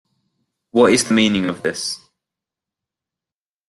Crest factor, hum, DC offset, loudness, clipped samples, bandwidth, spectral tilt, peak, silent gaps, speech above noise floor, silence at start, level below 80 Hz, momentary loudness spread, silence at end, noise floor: 20 dB; none; under 0.1%; -17 LUFS; under 0.1%; 12.5 kHz; -3.5 dB/octave; -2 dBFS; none; over 74 dB; 0.75 s; -56 dBFS; 12 LU; 1.75 s; under -90 dBFS